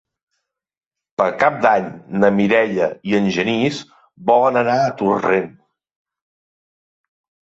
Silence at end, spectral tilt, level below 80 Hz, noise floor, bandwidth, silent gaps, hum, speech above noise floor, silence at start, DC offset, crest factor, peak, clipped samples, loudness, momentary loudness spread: 2 s; -6 dB/octave; -58 dBFS; -76 dBFS; 7.8 kHz; none; none; 59 dB; 1.2 s; under 0.1%; 18 dB; -2 dBFS; under 0.1%; -17 LUFS; 9 LU